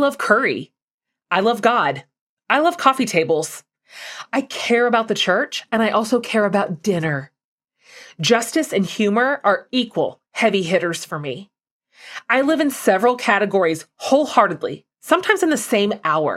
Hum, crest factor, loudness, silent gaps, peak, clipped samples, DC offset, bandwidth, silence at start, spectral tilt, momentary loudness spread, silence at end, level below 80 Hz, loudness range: none; 18 dB; -19 LUFS; 0.82-0.88 s, 0.94-0.98 s, 2.21-2.37 s, 7.44-7.58 s, 11.71-11.80 s; 0 dBFS; under 0.1%; under 0.1%; 16 kHz; 0 s; -4 dB/octave; 11 LU; 0 s; -68 dBFS; 3 LU